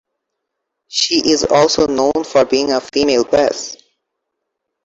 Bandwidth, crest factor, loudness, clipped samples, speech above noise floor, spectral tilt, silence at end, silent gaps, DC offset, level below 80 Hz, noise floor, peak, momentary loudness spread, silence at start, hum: 8.2 kHz; 16 dB; -14 LUFS; under 0.1%; 62 dB; -3 dB/octave; 1.1 s; none; under 0.1%; -48 dBFS; -76 dBFS; -2 dBFS; 6 LU; 0.9 s; none